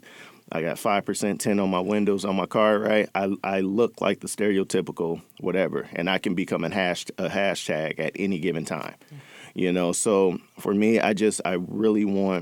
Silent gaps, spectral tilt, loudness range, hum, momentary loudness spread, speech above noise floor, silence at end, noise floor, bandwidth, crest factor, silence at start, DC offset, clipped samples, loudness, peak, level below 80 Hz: none; -5 dB/octave; 3 LU; none; 8 LU; 24 dB; 0 s; -48 dBFS; 17.5 kHz; 20 dB; 0.05 s; under 0.1%; under 0.1%; -25 LUFS; -4 dBFS; -66 dBFS